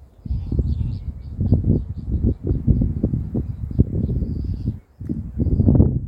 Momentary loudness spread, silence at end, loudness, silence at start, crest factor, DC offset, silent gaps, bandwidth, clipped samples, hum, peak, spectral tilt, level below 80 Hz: 11 LU; 0 s; -22 LUFS; 0 s; 20 dB; under 0.1%; none; 5 kHz; under 0.1%; none; 0 dBFS; -12.5 dB/octave; -26 dBFS